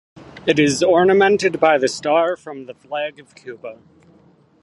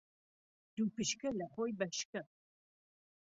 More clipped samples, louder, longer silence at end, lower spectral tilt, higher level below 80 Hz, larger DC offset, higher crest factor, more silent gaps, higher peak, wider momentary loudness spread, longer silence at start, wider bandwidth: neither; first, -17 LUFS vs -40 LUFS; about the same, 0.9 s vs 1 s; about the same, -4.5 dB/octave vs -4 dB/octave; first, -58 dBFS vs -76 dBFS; neither; about the same, 18 dB vs 20 dB; second, none vs 2.05-2.13 s; first, 0 dBFS vs -22 dBFS; first, 21 LU vs 11 LU; second, 0.15 s vs 0.75 s; first, 11.5 kHz vs 7.6 kHz